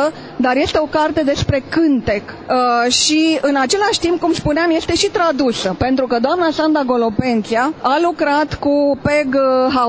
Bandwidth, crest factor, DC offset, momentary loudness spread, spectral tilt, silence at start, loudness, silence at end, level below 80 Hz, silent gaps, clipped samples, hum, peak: 8 kHz; 14 dB; under 0.1%; 4 LU; -4 dB/octave; 0 s; -15 LUFS; 0 s; -38 dBFS; none; under 0.1%; none; 0 dBFS